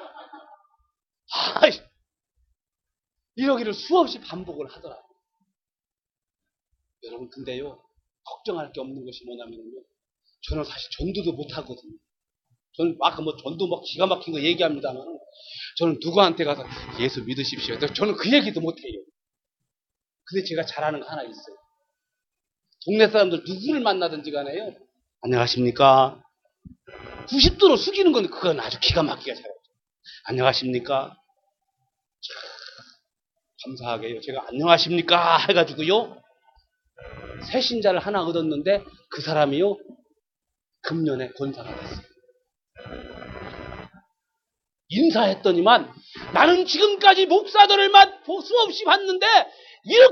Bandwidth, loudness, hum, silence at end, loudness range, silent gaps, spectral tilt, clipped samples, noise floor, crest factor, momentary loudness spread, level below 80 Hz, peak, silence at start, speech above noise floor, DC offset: 6.8 kHz; -21 LUFS; none; 0 s; 19 LU; none; -5 dB/octave; under 0.1%; under -90 dBFS; 22 dB; 22 LU; -46 dBFS; 0 dBFS; 0 s; over 68 dB; under 0.1%